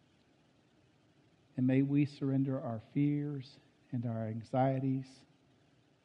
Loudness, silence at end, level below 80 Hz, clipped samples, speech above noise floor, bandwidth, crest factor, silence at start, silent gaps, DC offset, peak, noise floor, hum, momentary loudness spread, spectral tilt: -35 LUFS; 0.9 s; -76 dBFS; under 0.1%; 35 dB; 6.4 kHz; 18 dB; 1.55 s; none; under 0.1%; -18 dBFS; -69 dBFS; none; 13 LU; -9.5 dB/octave